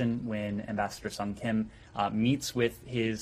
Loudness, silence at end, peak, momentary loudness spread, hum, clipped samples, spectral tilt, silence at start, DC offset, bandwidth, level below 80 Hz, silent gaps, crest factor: -32 LUFS; 0 s; -14 dBFS; 6 LU; none; under 0.1%; -5.5 dB/octave; 0 s; under 0.1%; 15.5 kHz; -56 dBFS; none; 18 dB